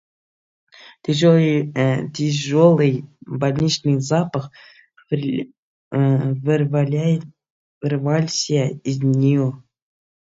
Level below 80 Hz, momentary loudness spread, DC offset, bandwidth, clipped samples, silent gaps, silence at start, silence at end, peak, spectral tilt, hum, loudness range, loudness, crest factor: -58 dBFS; 12 LU; under 0.1%; 7.8 kHz; under 0.1%; 5.58-5.91 s, 7.50-7.81 s; 1.1 s; 0.75 s; -2 dBFS; -6.5 dB/octave; none; 4 LU; -19 LUFS; 18 dB